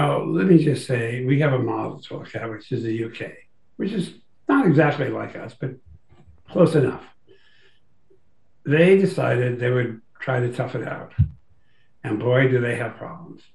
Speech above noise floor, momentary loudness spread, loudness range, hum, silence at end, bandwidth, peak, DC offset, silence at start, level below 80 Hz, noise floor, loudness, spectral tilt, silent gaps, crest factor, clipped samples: 46 dB; 17 LU; 4 LU; none; 0.2 s; 11.5 kHz; -2 dBFS; 0.3%; 0 s; -50 dBFS; -67 dBFS; -22 LUFS; -8 dB/octave; none; 20 dB; under 0.1%